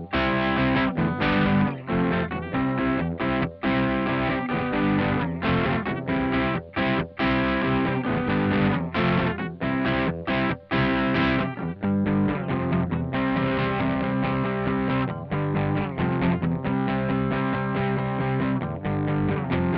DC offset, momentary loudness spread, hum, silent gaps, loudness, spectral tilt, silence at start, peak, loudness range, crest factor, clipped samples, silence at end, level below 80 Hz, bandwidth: under 0.1%; 4 LU; none; none; -24 LUFS; -9.5 dB/octave; 0 s; -12 dBFS; 1 LU; 12 dB; under 0.1%; 0 s; -42 dBFS; 5.8 kHz